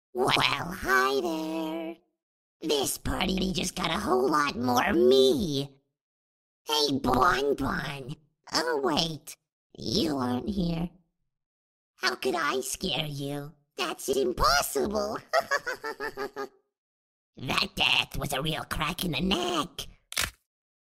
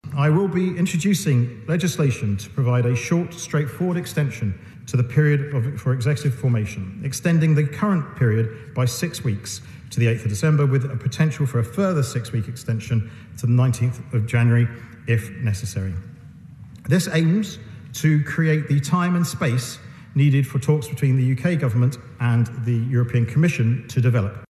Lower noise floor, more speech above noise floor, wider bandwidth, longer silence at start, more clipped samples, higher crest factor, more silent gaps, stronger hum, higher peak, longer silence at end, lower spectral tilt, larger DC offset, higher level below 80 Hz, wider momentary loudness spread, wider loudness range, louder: first, under -90 dBFS vs -42 dBFS; first, over 62 dB vs 21 dB; first, 16 kHz vs 13.5 kHz; about the same, 0.15 s vs 0.05 s; neither; first, 20 dB vs 14 dB; first, 2.23-2.60 s, 6.01-6.65 s, 9.52-9.70 s, 11.46-11.94 s, 16.78-17.33 s vs none; neither; second, -10 dBFS vs -6 dBFS; first, 0.55 s vs 0.05 s; second, -3.5 dB/octave vs -6.5 dB/octave; neither; about the same, -48 dBFS vs -48 dBFS; first, 13 LU vs 9 LU; first, 6 LU vs 2 LU; second, -27 LUFS vs -21 LUFS